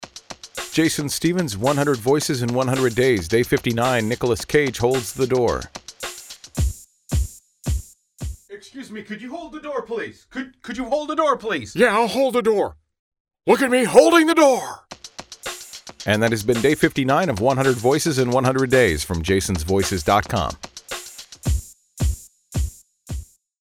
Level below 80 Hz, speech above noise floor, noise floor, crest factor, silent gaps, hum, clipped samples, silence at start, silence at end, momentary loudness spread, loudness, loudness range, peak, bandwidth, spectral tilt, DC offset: -36 dBFS; 21 dB; -40 dBFS; 20 dB; 12.99-13.12 s, 13.20-13.25 s; none; under 0.1%; 0 s; 0.4 s; 18 LU; -20 LUFS; 12 LU; 0 dBFS; 18 kHz; -5 dB/octave; under 0.1%